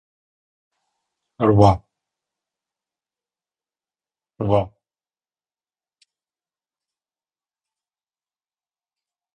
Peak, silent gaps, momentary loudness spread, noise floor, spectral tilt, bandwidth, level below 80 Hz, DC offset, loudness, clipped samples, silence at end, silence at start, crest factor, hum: -2 dBFS; none; 14 LU; under -90 dBFS; -8.5 dB/octave; 8.8 kHz; -46 dBFS; under 0.1%; -19 LUFS; under 0.1%; 4.65 s; 1.4 s; 26 dB; none